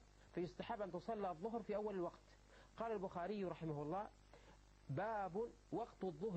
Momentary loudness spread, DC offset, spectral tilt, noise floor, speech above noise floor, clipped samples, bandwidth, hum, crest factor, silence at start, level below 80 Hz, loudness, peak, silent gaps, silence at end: 21 LU; under 0.1%; -7.5 dB/octave; -66 dBFS; 20 dB; under 0.1%; 8.4 kHz; none; 14 dB; 0 s; -70 dBFS; -47 LUFS; -32 dBFS; none; 0 s